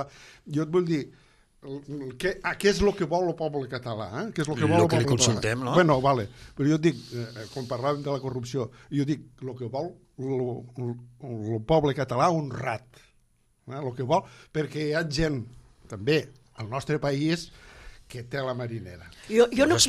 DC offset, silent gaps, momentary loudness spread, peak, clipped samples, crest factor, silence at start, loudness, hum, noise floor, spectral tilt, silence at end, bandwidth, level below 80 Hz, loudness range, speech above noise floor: under 0.1%; none; 17 LU; -6 dBFS; under 0.1%; 20 dB; 0 s; -27 LUFS; none; -65 dBFS; -5 dB/octave; 0 s; 14.5 kHz; -50 dBFS; 7 LU; 39 dB